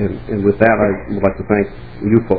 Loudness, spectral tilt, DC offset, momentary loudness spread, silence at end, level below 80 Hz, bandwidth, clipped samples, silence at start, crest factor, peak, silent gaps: -16 LUFS; -11.5 dB/octave; 1%; 8 LU; 0 s; -36 dBFS; 4.9 kHz; 0.1%; 0 s; 16 dB; 0 dBFS; none